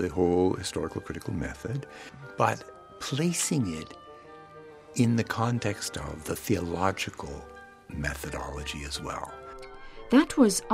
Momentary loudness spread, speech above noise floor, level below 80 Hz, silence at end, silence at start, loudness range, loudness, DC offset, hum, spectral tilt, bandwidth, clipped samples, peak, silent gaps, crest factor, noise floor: 22 LU; 20 dB; -48 dBFS; 0 s; 0 s; 3 LU; -29 LUFS; under 0.1%; none; -5 dB/octave; 16 kHz; under 0.1%; -8 dBFS; none; 22 dB; -48 dBFS